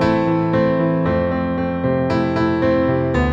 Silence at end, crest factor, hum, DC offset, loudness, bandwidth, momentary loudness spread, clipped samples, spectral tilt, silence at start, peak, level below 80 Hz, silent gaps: 0 s; 14 dB; none; under 0.1%; -18 LUFS; 7.6 kHz; 3 LU; under 0.1%; -8.5 dB/octave; 0 s; -4 dBFS; -34 dBFS; none